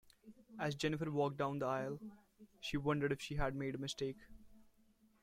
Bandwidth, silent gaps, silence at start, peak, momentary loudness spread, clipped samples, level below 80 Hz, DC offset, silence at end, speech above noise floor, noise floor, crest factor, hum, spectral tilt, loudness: 15.5 kHz; none; 0.25 s; -24 dBFS; 11 LU; under 0.1%; -58 dBFS; under 0.1%; 0.6 s; 32 dB; -71 dBFS; 18 dB; none; -5.5 dB/octave; -40 LUFS